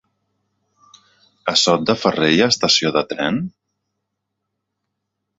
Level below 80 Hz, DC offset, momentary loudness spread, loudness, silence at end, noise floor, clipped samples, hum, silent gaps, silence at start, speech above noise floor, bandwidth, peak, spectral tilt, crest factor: -58 dBFS; under 0.1%; 10 LU; -17 LUFS; 1.9 s; -77 dBFS; under 0.1%; none; none; 1.45 s; 60 dB; 8 kHz; -2 dBFS; -3.5 dB/octave; 20 dB